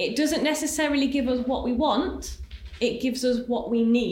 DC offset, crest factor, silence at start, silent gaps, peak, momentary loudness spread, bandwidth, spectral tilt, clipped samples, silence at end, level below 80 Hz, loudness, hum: under 0.1%; 14 dB; 0 s; none; -12 dBFS; 9 LU; 17 kHz; -4 dB/octave; under 0.1%; 0 s; -44 dBFS; -25 LUFS; none